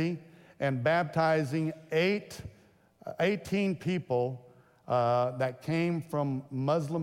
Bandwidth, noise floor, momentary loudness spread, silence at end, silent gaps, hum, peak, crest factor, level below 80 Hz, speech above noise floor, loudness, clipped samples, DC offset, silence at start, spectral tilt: 16 kHz; -60 dBFS; 14 LU; 0 s; none; none; -16 dBFS; 16 dB; -68 dBFS; 30 dB; -30 LUFS; under 0.1%; under 0.1%; 0 s; -7 dB/octave